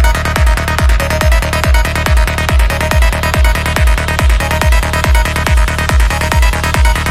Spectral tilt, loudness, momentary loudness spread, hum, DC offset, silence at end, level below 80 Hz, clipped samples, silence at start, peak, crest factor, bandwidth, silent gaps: -4.5 dB/octave; -12 LUFS; 1 LU; none; under 0.1%; 0 s; -12 dBFS; under 0.1%; 0 s; 0 dBFS; 10 dB; 15 kHz; none